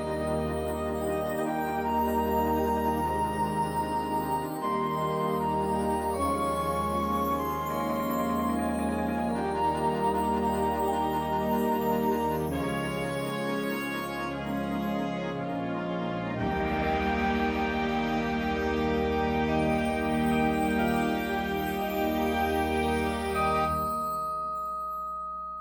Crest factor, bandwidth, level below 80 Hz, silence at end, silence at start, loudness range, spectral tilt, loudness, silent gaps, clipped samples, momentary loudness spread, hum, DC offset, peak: 14 dB; over 20 kHz; -44 dBFS; 0 s; 0 s; 3 LU; -6 dB/octave; -29 LUFS; none; under 0.1%; 5 LU; none; under 0.1%; -14 dBFS